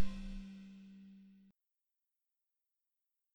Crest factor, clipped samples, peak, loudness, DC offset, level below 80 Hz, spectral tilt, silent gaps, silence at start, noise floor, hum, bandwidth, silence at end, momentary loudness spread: 22 dB; under 0.1%; -20 dBFS; -52 LUFS; under 0.1%; -56 dBFS; -6.5 dB/octave; none; 0 s; -90 dBFS; none; 19.5 kHz; 0 s; 16 LU